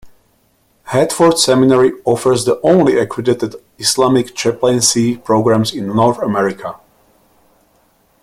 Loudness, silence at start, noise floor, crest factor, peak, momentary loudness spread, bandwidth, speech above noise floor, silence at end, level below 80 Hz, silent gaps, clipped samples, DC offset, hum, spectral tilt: -13 LUFS; 0.05 s; -57 dBFS; 14 dB; 0 dBFS; 7 LU; 16 kHz; 44 dB; 1.45 s; -52 dBFS; none; under 0.1%; under 0.1%; none; -4.5 dB/octave